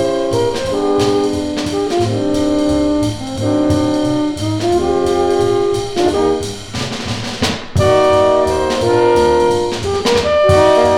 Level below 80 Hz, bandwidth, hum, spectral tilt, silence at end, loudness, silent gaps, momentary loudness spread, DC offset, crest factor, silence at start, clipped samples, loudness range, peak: -36 dBFS; 15.5 kHz; none; -5.5 dB/octave; 0 s; -15 LUFS; none; 7 LU; under 0.1%; 14 dB; 0 s; under 0.1%; 3 LU; 0 dBFS